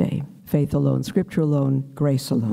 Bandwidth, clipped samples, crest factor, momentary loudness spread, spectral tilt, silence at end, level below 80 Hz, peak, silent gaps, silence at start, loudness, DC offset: 15.5 kHz; under 0.1%; 12 dB; 4 LU; -8 dB/octave; 0 s; -50 dBFS; -8 dBFS; none; 0 s; -22 LUFS; under 0.1%